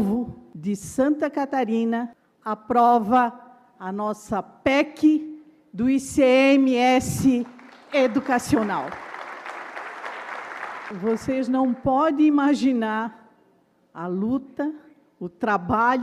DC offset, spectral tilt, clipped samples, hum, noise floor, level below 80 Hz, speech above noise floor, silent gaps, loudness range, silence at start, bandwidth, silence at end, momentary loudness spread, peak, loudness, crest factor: under 0.1%; -5.5 dB/octave; under 0.1%; none; -62 dBFS; -56 dBFS; 40 dB; none; 7 LU; 0 s; 14 kHz; 0 s; 17 LU; -8 dBFS; -22 LUFS; 16 dB